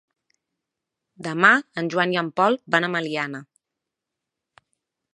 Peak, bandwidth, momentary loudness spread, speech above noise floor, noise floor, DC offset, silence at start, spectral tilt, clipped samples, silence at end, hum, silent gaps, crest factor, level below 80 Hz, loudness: -2 dBFS; 11 kHz; 14 LU; 63 dB; -85 dBFS; under 0.1%; 1.2 s; -5 dB/octave; under 0.1%; 1.7 s; none; none; 24 dB; -76 dBFS; -21 LUFS